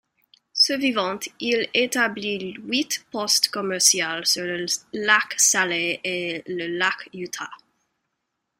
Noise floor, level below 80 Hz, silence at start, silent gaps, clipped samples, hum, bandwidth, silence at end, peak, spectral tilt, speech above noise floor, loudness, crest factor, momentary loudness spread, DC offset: -79 dBFS; -70 dBFS; 0.55 s; none; under 0.1%; none; 16 kHz; 1.05 s; -2 dBFS; -1 dB/octave; 55 dB; -21 LUFS; 22 dB; 13 LU; under 0.1%